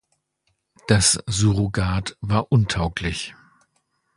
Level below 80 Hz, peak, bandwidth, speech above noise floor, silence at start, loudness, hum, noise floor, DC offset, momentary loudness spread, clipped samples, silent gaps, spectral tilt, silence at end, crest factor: -38 dBFS; -2 dBFS; 11.5 kHz; 51 dB; 0.9 s; -21 LUFS; none; -72 dBFS; under 0.1%; 12 LU; under 0.1%; none; -4 dB/octave; 0.85 s; 22 dB